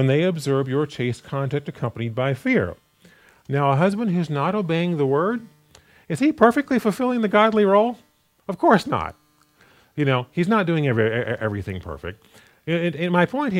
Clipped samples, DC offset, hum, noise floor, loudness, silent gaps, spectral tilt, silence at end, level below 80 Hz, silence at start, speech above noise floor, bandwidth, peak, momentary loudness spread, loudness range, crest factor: under 0.1%; under 0.1%; none; -57 dBFS; -21 LUFS; none; -7 dB/octave; 0 s; -58 dBFS; 0 s; 36 dB; 15.5 kHz; 0 dBFS; 14 LU; 4 LU; 20 dB